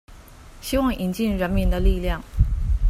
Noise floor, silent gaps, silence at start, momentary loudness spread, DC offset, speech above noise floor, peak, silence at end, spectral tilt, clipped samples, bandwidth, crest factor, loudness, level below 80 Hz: -44 dBFS; none; 0.1 s; 4 LU; under 0.1%; 22 dB; -4 dBFS; 0 s; -6.5 dB/octave; under 0.1%; 15.5 kHz; 18 dB; -24 LUFS; -24 dBFS